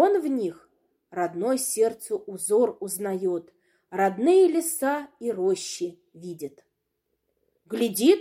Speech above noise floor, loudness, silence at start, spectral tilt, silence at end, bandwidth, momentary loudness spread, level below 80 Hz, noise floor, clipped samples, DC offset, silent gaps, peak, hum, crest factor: 53 dB; -25 LUFS; 0 s; -4 dB/octave; 0 s; 16.5 kHz; 16 LU; -78 dBFS; -78 dBFS; under 0.1%; under 0.1%; none; -6 dBFS; none; 18 dB